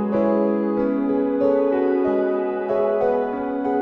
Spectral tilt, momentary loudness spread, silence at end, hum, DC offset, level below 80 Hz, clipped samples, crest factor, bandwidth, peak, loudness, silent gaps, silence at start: -9.5 dB/octave; 4 LU; 0 s; none; under 0.1%; -54 dBFS; under 0.1%; 14 dB; 5.2 kHz; -6 dBFS; -21 LUFS; none; 0 s